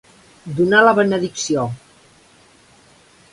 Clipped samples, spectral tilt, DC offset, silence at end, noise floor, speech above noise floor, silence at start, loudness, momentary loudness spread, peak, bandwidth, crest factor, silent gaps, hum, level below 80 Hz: under 0.1%; -4.5 dB/octave; under 0.1%; 1.55 s; -51 dBFS; 35 dB; 0.45 s; -16 LUFS; 20 LU; 0 dBFS; 11.5 kHz; 20 dB; none; none; -58 dBFS